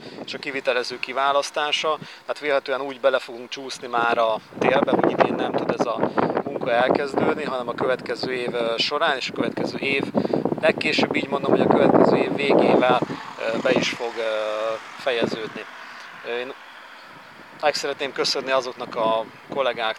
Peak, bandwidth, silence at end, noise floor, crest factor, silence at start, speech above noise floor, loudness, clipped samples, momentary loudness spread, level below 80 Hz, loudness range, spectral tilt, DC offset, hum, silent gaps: -2 dBFS; 13.5 kHz; 0 s; -43 dBFS; 20 dB; 0 s; 21 dB; -22 LUFS; under 0.1%; 13 LU; -68 dBFS; 8 LU; -4.5 dB/octave; under 0.1%; none; none